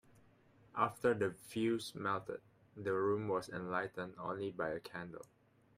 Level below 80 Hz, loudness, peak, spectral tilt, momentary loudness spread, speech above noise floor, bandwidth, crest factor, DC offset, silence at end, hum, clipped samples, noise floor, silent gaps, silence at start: -74 dBFS; -39 LUFS; -18 dBFS; -6 dB/octave; 13 LU; 28 dB; 15.5 kHz; 22 dB; under 0.1%; 0.55 s; none; under 0.1%; -67 dBFS; none; 0.75 s